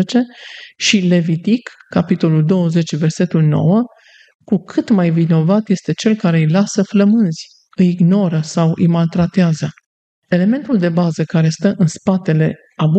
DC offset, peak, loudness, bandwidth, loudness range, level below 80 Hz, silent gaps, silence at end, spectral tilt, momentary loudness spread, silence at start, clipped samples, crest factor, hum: under 0.1%; 0 dBFS; -15 LUFS; 8.6 kHz; 2 LU; -56 dBFS; 4.35-4.39 s, 9.86-10.22 s; 0 s; -6.5 dB/octave; 6 LU; 0 s; under 0.1%; 14 dB; none